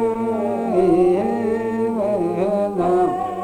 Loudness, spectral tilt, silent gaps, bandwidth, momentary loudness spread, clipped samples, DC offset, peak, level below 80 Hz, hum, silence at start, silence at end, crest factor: -19 LUFS; -8 dB/octave; none; 9.8 kHz; 6 LU; under 0.1%; under 0.1%; -6 dBFS; -50 dBFS; none; 0 s; 0 s; 14 dB